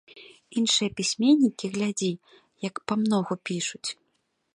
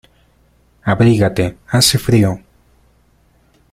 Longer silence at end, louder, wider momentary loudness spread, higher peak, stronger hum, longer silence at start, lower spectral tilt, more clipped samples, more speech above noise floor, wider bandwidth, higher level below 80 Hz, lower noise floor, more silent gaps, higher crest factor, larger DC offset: second, 0.65 s vs 1.35 s; second, -26 LUFS vs -14 LUFS; first, 14 LU vs 9 LU; second, -10 dBFS vs 0 dBFS; second, none vs 60 Hz at -35 dBFS; second, 0.15 s vs 0.85 s; about the same, -4 dB/octave vs -5 dB/octave; neither; first, 48 dB vs 41 dB; second, 11 kHz vs 16 kHz; second, -68 dBFS vs -42 dBFS; first, -74 dBFS vs -54 dBFS; neither; about the same, 18 dB vs 16 dB; neither